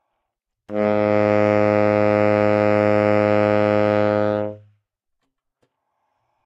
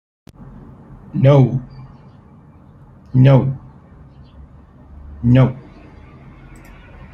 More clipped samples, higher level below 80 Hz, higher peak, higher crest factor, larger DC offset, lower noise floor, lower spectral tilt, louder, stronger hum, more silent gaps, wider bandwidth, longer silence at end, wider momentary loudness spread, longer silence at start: neither; second, -58 dBFS vs -42 dBFS; about the same, -4 dBFS vs -2 dBFS; about the same, 16 dB vs 18 dB; neither; first, -79 dBFS vs -44 dBFS; second, -8.5 dB/octave vs -10 dB/octave; second, -18 LUFS vs -15 LUFS; neither; neither; first, 7.6 kHz vs 4.1 kHz; first, 1.9 s vs 1.55 s; second, 6 LU vs 27 LU; second, 0.7 s vs 1.15 s